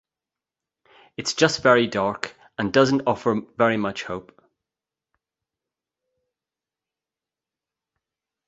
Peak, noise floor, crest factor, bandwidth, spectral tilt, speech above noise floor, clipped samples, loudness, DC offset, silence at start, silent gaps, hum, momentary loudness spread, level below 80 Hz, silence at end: -2 dBFS; -89 dBFS; 24 dB; 8.2 kHz; -4.5 dB/octave; 68 dB; under 0.1%; -22 LUFS; under 0.1%; 1.2 s; none; none; 14 LU; -60 dBFS; 4.25 s